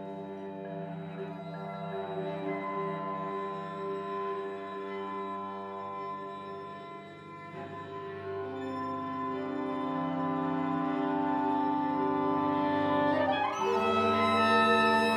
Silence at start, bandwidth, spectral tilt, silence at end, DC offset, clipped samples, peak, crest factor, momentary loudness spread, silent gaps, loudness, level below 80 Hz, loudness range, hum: 0 s; 15 kHz; -6 dB/octave; 0 s; under 0.1%; under 0.1%; -12 dBFS; 20 dB; 15 LU; none; -32 LUFS; -74 dBFS; 12 LU; none